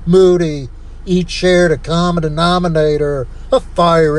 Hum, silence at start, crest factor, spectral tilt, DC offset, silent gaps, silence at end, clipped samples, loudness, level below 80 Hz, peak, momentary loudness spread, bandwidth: none; 0 s; 12 dB; -6.5 dB/octave; under 0.1%; none; 0 s; under 0.1%; -14 LUFS; -28 dBFS; 0 dBFS; 10 LU; 10.5 kHz